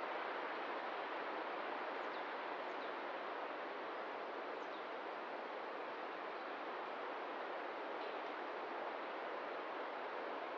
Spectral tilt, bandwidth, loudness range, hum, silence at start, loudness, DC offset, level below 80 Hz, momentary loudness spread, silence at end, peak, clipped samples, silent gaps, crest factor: 0 dB/octave; 8 kHz; 2 LU; none; 0 s; -45 LUFS; under 0.1%; under -90 dBFS; 3 LU; 0 s; -32 dBFS; under 0.1%; none; 14 dB